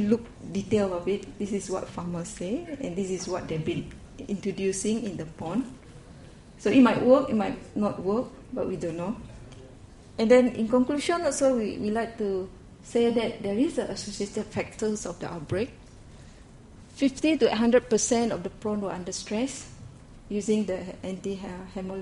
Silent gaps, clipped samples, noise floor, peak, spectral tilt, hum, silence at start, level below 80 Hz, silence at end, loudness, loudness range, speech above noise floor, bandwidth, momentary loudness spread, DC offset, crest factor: none; under 0.1%; -49 dBFS; -8 dBFS; -5 dB/octave; none; 0 s; -52 dBFS; 0 s; -27 LUFS; 7 LU; 22 dB; 11.5 kHz; 15 LU; under 0.1%; 20 dB